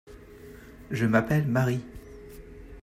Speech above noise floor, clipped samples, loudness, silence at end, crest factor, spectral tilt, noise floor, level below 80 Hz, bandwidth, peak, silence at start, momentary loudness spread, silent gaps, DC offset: 22 dB; under 0.1%; -26 LUFS; 0.05 s; 20 dB; -7.5 dB/octave; -47 dBFS; -50 dBFS; 15.5 kHz; -10 dBFS; 0.1 s; 24 LU; none; under 0.1%